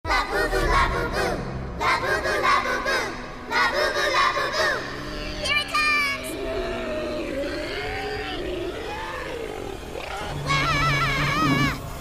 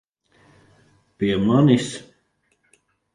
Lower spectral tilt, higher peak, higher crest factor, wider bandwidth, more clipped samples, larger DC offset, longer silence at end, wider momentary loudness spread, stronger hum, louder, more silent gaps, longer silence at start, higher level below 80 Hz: second, -4 dB/octave vs -6.5 dB/octave; second, -10 dBFS vs -2 dBFS; about the same, 16 dB vs 20 dB; first, 16 kHz vs 11.5 kHz; neither; neither; second, 0 s vs 1.15 s; second, 11 LU vs 15 LU; neither; second, -24 LUFS vs -19 LUFS; neither; second, 0.05 s vs 1.2 s; first, -36 dBFS vs -54 dBFS